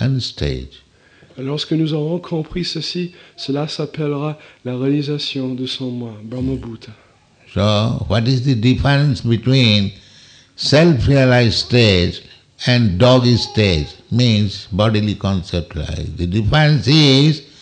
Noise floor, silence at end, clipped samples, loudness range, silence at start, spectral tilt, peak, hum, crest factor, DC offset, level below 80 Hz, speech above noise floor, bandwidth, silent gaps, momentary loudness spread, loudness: -49 dBFS; 0.2 s; under 0.1%; 8 LU; 0 s; -6 dB/octave; -2 dBFS; none; 14 dB; under 0.1%; -36 dBFS; 33 dB; 9.2 kHz; none; 13 LU; -16 LUFS